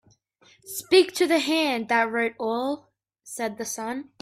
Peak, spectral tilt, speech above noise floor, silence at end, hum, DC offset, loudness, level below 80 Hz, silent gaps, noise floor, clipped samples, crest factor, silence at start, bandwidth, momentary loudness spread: -6 dBFS; -2.5 dB/octave; 35 dB; 0.2 s; none; under 0.1%; -24 LUFS; -70 dBFS; none; -60 dBFS; under 0.1%; 18 dB; 0.65 s; 16 kHz; 15 LU